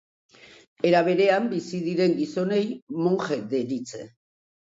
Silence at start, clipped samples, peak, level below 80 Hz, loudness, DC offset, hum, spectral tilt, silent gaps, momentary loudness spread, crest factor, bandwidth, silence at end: 0.85 s; under 0.1%; -6 dBFS; -72 dBFS; -24 LUFS; under 0.1%; none; -6.5 dB/octave; 2.82-2.87 s; 10 LU; 18 dB; 7.8 kHz; 0.7 s